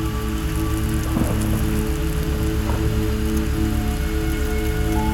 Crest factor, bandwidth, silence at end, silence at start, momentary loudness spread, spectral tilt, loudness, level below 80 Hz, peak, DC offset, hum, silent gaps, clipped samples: 14 dB; 18 kHz; 0 s; 0 s; 2 LU; -6 dB/octave; -23 LUFS; -24 dBFS; -8 dBFS; 0.1%; none; none; under 0.1%